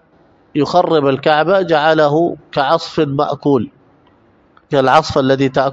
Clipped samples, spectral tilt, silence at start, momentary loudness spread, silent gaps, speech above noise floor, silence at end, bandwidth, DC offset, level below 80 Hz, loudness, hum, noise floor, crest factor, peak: 0.1%; -6.5 dB/octave; 0.55 s; 7 LU; none; 38 dB; 0 s; 8.4 kHz; under 0.1%; -50 dBFS; -14 LUFS; none; -51 dBFS; 14 dB; 0 dBFS